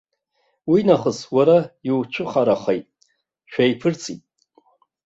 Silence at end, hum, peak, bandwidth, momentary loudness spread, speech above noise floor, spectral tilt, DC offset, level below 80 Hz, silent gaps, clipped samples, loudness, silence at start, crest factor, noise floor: 0.9 s; none; -2 dBFS; 8 kHz; 14 LU; 50 dB; -6 dB/octave; under 0.1%; -62 dBFS; none; under 0.1%; -20 LUFS; 0.65 s; 20 dB; -69 dBFS